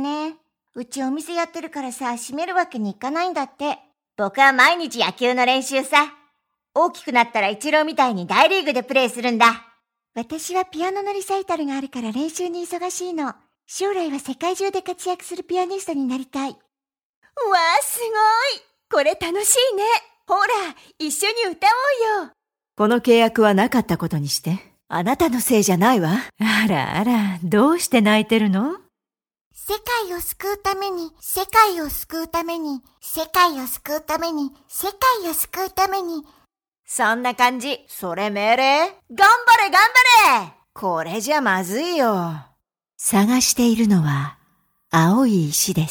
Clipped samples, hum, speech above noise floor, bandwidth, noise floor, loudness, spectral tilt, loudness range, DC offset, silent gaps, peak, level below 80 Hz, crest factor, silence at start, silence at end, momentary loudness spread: under 0.1%; none; over 71 dB; over 20 kHz; under -90 dBFS; -19 LUFS; -3.5 dB/octave; 10 LU; under 0.1%; 17.05-17.22 s, 29.41-29.51 s; 0 dBFS; -54 dBFS; 20 dB; 0 s; 0 s; 12 LU